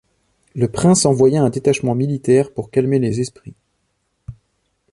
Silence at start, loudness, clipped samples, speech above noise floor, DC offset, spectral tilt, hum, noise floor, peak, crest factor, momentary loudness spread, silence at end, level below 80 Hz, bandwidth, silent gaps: 0.55 s; -17 LUFS; under 0.1%; 52 dB; under 0.1%; -6 dB/octave; none; -68 dBFS; -2 dBFS; 16 dB; 9 LU; 0.6 s; -48 dBFS; 11.5 kHz; none